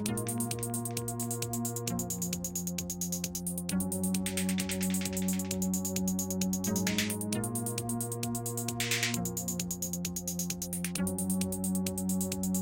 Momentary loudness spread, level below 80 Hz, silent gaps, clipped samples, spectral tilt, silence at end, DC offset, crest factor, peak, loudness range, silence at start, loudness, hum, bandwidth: 4 LU; -58 dBFS; none; under 0.1%; -4 dB/octave; 0 s; under 0.1%; 18 dB; -14 dBFS; 2 LU; 0 s; -33 LUFS; none; 17 kHz